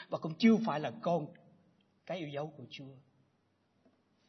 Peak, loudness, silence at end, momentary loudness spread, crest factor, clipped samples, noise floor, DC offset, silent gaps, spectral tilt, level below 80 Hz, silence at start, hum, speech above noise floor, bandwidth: -14 dBFS; -34 LUFS; 1.3 s; 21 LU; 22 dB; under 0.1%; -75 dBFS; under 0.1%; none; -5.5 dB/octave; -84 dBFS; 0 s; none; 41 dB; 6.2 kHz